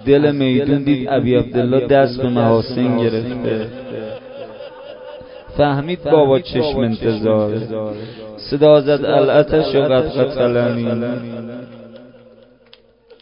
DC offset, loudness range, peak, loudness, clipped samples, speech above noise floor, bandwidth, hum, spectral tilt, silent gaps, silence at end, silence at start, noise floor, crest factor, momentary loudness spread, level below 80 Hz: under 0.1%; 6 LU; 0 dBFS; -16 LUFS; under 0.1%; 34 dB; 5.4 kHz; none; -11 dB/octave; none; 1.15 s; 0 s; -49 dBFS; 16 dB; 19 LU; -44 dBFS